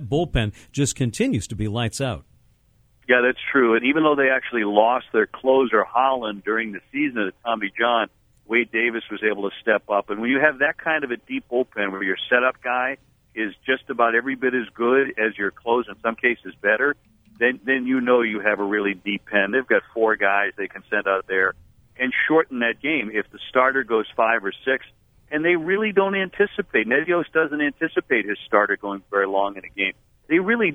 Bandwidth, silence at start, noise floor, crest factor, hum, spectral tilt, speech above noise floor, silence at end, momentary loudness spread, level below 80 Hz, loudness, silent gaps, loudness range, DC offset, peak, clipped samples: 13.5 kHz; 0 s; -59 dBFS; 22 dB; none; -5 dB/octave; 38 dB; 0 s; 8 LU; -50 dBFS; -21 LUFS; none; 3 LU; under 0.1%; 0 dBFS; under 0.1%